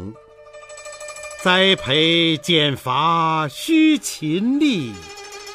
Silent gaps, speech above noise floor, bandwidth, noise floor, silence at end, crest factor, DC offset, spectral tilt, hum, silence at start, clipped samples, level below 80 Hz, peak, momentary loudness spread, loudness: none; 25 dB; 15.5 kHz; -43 dBFS; 0 s; 18 dB; under 0.1%; -4 dB/octave; 50 Hz at -60 dBFS; 0 s; under 0.1%; -56 dBFS; -2 dBFS; 20 LU; -17 LUFS